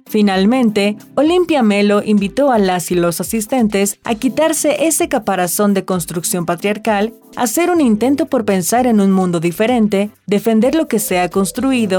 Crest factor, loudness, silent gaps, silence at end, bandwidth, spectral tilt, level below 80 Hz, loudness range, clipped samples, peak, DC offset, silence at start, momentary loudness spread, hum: 10 dB; -15 LUFS; none; 0 s; 20 kHz; -5 dB/octave; -48 dBFS; 2 LU; under 0.1%; -4 dBFS; under 0.1%; 0.1 s; 5 LU; none